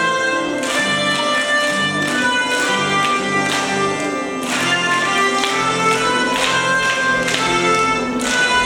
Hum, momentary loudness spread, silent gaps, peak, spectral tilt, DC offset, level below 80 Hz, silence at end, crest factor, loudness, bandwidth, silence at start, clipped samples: none; 3 LU; none; 0 dBFS; -2.5 dB/octave; under 0.1%; -50 dBFS; 0 s; 18 dB; -16 LUFS; 18 kHz; 0 s; under 0.1%